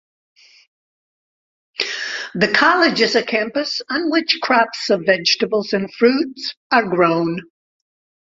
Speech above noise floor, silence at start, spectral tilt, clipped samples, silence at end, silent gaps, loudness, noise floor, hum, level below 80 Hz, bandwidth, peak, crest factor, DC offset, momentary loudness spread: over 73 dB; 1.8 s; -4 dB/octave; under 0.1%; 0.85 s; 6.57-6.70 s; -17 LUFS; under -90 dBFS; none; -62 dBFS; 7.8 kHz; 0 dBFS; 18 dB; under 0.1%; 10 LU